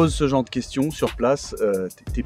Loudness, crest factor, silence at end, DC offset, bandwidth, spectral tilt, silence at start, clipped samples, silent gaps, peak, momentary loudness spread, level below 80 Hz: -23 LUFS; 16 dB; 0 s; under 0.1%; 16 kHz; -6 dB/octave; 0 s; under 0.1%; none; -6 dBFS; 6 LU; -36 dBFS